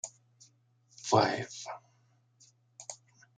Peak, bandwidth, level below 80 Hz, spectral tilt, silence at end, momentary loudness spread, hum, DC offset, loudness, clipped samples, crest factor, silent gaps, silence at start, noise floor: -8 dBFS; 9.6 kHz; -76 dBFS; -4 dB/octave; 0.4 s; 21 LU; none; under 0.1%; -32 LUFS; under 0.1%; 28 dB; none; 0.05 s; -69 dBFS